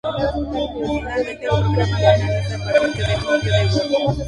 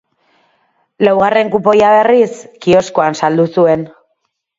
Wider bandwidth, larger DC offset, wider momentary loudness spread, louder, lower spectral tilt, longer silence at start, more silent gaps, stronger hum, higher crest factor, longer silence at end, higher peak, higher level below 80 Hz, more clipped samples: first, 11 kHz vs 7.8 kHz; neither; about the same, 8 LU vs 9 LU; second, -19 LUFS vs -12 LUFS; about the same, -6 dB/octave vs -6 dB/octave; second, 0.05 s vs 1 s; neither; neither; first, 18 dB vs 12 dB; second, 0 s vs 0.7 s; about the same, -2 dBFS vs 0 dBFS; first, -34 dBFS vs -54 dBFS; neither